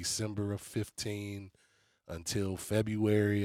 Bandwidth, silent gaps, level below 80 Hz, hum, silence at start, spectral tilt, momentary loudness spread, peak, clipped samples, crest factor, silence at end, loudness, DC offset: 16 kHz; none; -64 dBFS; none; 0 s; -5 dB/octave; 15 LU; -16 dBFS; under 0.1%; 18 dB; 0 s; -34 LUFS; under 0.1%